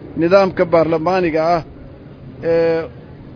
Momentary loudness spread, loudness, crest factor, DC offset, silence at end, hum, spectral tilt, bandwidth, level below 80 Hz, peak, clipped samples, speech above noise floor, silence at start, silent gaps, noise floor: 15 LU; -16 LUFS; 16 dB; under 0.1%; 0 s; none; -7.5 dB/octave; 5.4 kHz; -44 dBFS; 0 dBFS; under 0.1%; 22 dB; 0 s; none; -36 dBFS